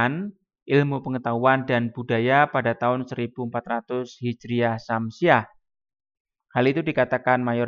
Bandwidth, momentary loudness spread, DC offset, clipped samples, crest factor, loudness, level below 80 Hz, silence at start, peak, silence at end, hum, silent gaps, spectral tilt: 7.2 kHz; 10 LU; under 0.1%; under 0.1%; 20 dB; -23 LUFS; -66 dBFS; 0 s; -4 dBFS; 0 s; none; 0.62-0.66 s, 6.20-6.25 s; -7.5 dB/octave